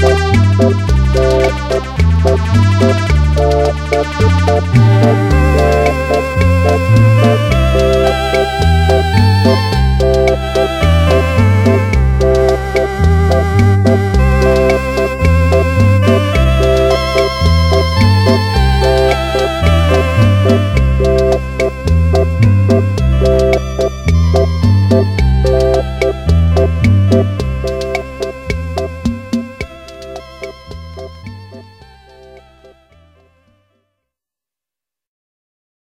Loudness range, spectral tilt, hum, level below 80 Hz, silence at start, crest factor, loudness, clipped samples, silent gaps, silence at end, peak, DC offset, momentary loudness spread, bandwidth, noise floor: 7 LU; -7 dB/octave; none; -18 dBFS; 0 s; 12 dB; -12 LUFS; under 0.1%; none; 4.2 s; 0 dBFS; under 0.1%; 9 LU; 14.5 kHz; -88 dBFS